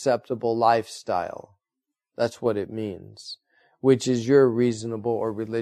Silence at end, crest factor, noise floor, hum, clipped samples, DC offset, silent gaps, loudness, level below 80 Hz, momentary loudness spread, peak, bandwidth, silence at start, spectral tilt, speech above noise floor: 0 s; 18 dB; -86 dBFS; none; under 0.1%; under 0.1%; none; -24 LUFS; -66 dBFS; 20 LU; -6 dBFS; 12.5 kHz; 0 s; -6 dB/octave; 62 dB